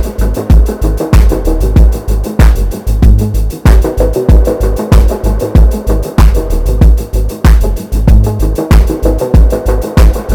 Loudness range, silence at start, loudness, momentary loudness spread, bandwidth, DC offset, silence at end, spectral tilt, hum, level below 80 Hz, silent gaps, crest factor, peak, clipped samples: 1 LU; 0 s; -10 LUFS; 6 LU; 16 kHz; 0.4%; 0 s; -7.5 dB/octave; none; -8 dBFS; none; 8 dB; 0 dBFS; 4%